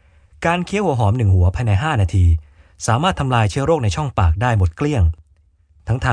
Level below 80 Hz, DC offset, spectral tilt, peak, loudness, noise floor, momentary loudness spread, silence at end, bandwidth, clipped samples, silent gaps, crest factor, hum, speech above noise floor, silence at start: -28 dBFS; under 0.1%; -6.5 dB/octave; -2 dBFS; -18 LUFS; -55 dBFS; 7 LU; 0 s; 10 kHz; under 0.1%; none; 16 dB; none; 39 dB; 0.4 s